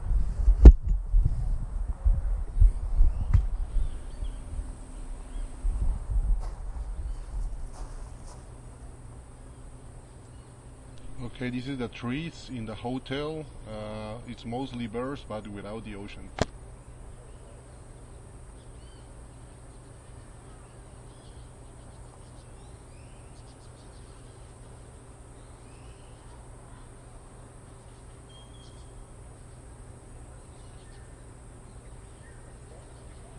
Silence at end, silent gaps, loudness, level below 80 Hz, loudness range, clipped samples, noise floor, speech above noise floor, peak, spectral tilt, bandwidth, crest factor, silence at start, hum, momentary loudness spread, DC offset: 0 s; none; -30 LUFS; -30 dBFS; 18 LU; under 0.1%; -48 dBFS; 13 dB; 0 dBFS; -7 dB/octave; 10.5 kHz; 28 dB; 0 s; none; 20 LU; under 0.1%